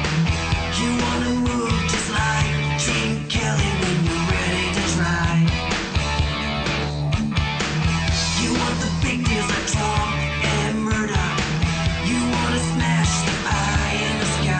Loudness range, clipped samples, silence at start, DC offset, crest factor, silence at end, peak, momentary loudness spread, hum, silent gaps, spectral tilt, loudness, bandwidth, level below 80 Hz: 1 LU; under 0.1%; 0 s; under 0.1%; 12 dB; 0 s; -10 dBFS; 2 LU; none; none; -4.5 dB/octave; -21 LUFS; 9.2 kHz; -30 dBFS